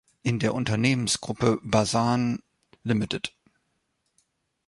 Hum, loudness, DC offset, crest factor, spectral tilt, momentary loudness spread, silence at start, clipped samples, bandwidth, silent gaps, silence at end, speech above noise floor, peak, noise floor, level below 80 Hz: none; -26 LUFS; under 0.1%; 22 dB; -5 dB/octave; 9 LU; 0.25 s; under 0.1%; 11.5 kHz; none; 1.4 s; 50 dB; -6 dBFS; -75 dBFS; -54 dBFS